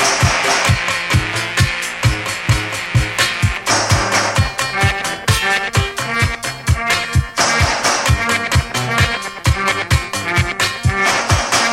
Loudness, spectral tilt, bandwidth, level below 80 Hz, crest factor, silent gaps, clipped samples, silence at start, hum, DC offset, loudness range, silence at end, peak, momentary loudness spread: -16 LUFS; -3 dB/octave; 16.5 kHz; -28 dBFS; 16 dB; none; under 0.1%; 0 s; none; under 0.1%; 1 LU; 0 s; 0 dBFS; 4 LU